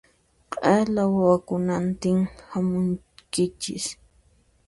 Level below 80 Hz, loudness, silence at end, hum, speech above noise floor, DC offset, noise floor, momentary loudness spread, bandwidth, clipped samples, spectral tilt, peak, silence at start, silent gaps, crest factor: -54 dBFS; -24 LUFS; 0.75 s; none; 38 dB; under 0.1%; -61 dBFS; 11 LU; 11.5 kHz; under 0.1%; -6 dB/octave; -6 dBFS; 0.5 s; none; 20 dB